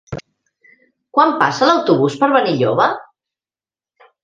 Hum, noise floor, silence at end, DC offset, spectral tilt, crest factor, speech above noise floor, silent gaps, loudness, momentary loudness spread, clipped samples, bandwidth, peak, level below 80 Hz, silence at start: none; under -90 dBFS; 1.2 s; under 0.1%; -5.5 dB/octave; 18 dB; over 76 dB; none; -15 LUFS; 13 LU; under 0.1%; 9.4 kHz; 0 dBFS; -54 dBFS; 0.1 s